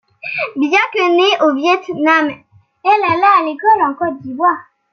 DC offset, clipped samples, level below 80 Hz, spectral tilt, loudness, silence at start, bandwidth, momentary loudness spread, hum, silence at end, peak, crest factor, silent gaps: under 0.1%; under 0.1%; -66 dBFS; -4 dB/octave; -14 LUFS; 0.25 s; 6.8 kHz; 10 LU; none; 0.3 s; -2 dBFS; 14 dB; none